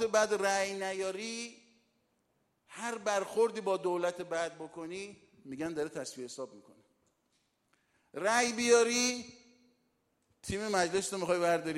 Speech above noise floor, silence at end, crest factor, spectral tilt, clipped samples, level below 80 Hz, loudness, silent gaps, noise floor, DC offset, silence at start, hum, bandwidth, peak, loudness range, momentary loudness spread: 44 dB; 0 s; 22 dB; -2.5 dB/octave; under 0.1%; -68 dBFS; -32 LUFS; none; -77 dBFS; under 0.1%; 0 s; none; 15.5 kHz; -12 dBFS; 10 LU; 16 LU